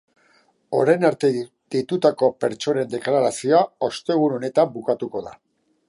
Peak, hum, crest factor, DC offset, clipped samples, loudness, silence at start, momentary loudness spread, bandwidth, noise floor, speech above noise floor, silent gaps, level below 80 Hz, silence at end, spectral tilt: -4 dBFS; none; 18 dB; under 0.1%; under 0.1%; -21 LUFS; 0.7 s; 9 LU; 11.5 kHz; -60 dBFS; 40 dB; none; -68 dBFS; 0.55 s; -5.5 dB/octave